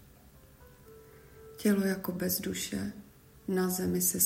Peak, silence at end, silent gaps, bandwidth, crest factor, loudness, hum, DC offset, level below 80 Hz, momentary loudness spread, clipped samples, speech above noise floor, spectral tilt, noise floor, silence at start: -14 dBFS; 0 s; none; 16 kHz; 20 dB; -31 LUFS; none; under 0.1%; -62 dBFS; 19 LU; under 0.1%; 27 dB; -4 dB/octave; -57 dBFS; 0.6 s